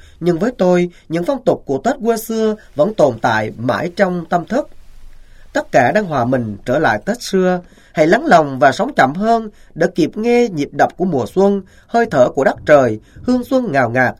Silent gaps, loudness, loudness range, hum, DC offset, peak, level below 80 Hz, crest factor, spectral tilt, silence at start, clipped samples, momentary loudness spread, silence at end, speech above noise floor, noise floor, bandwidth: none; -16 LUFS; 3 LU; none; under 0.1%; 0 dBFS; -44 dBFS; 16 dB; -6 dB/octave; 0.2 s; under 0.1%; 7 LU; 0.05 s; 21 dB; -36 dBFS; 15.5 kHz